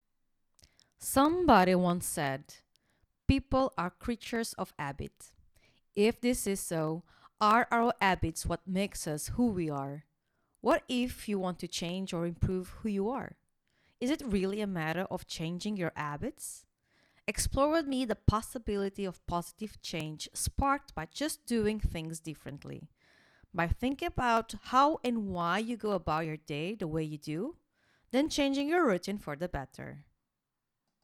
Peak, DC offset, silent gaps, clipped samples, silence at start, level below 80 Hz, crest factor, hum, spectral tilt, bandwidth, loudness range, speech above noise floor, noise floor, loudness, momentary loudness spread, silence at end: -8 dBFS; under 0.1%; none; under 0.1%; 1 s; -48 dBFS; 24 dB; none; -5 dB/octave; 18 kHz; 5 LU; 54 dB; -86 dBFS; -32 LUFS; 13 LU; 1 s